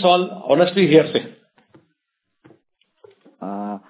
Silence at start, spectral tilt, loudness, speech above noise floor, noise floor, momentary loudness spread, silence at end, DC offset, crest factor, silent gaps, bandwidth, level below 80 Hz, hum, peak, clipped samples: 0 s; -10 dB/octave; -17 LUFS; 61 dB; -76 dBFS; 19 LU; 0.1 s; under 0.1%; 20 dB; none; 4 kHz; -72 dBFS; none; 0 dBFS; under 0.1%